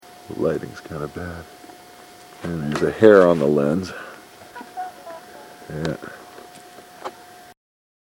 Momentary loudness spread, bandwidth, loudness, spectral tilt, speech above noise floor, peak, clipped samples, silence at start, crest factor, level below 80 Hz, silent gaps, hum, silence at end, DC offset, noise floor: 27 LU; 16.5 kHz; -19 LUFS; -6.5 dB/octave; 25 dB; 0 dBFS; under 0.1%; 0.3 s; 22 dB; -52 dBFS; none; none; 0.85 s; under 0.1%; -44 dBFS